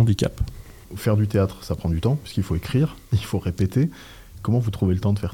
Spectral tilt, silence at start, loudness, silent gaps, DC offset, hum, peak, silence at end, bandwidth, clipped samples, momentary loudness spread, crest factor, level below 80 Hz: -7.5 dB/octave; 0 s; -24 LUFS; none; 0.1%; none; -8 dBFS; 0 s; 17 kHz; under 0.1%; 11 LU; 14 dB; -40 dBFS